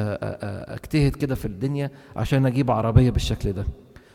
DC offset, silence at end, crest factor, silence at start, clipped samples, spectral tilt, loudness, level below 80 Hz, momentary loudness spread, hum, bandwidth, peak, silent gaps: under 0.1%; 0.35 s; 20 dB; 0 s; under 0.1%; -7.5 dB/octave; -24 LUFS; -34 dBFS; 13 LU; none; 15.5 kHz; -4 dBFS; none